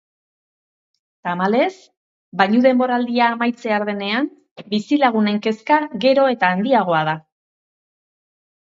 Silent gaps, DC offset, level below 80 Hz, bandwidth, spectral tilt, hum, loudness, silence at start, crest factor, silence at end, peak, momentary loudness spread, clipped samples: 1.97-2.32 s, 4.51-4.56 s; under 0.1%; -70 dBFS; 7.8 kHz; -6.5 dB/octave; none; -18 LUFS; 1.25 s; 20 dB; 1.45 s; 0 dBFS; 9 LU; under 0.1%